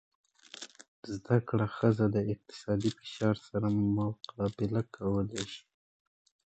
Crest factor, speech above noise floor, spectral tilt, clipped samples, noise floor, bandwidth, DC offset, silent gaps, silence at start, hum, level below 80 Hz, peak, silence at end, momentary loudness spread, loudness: 20 dB; 19 dB; -7 dB/octave; under 0.1%; -51 dBFS; 8.8 kHz; under 0.1%; 0.88-1.03 s; 0.55 s; none; -58 dBFS; -12 dBFS; 0.9 s; 17 LU; -32 LUFS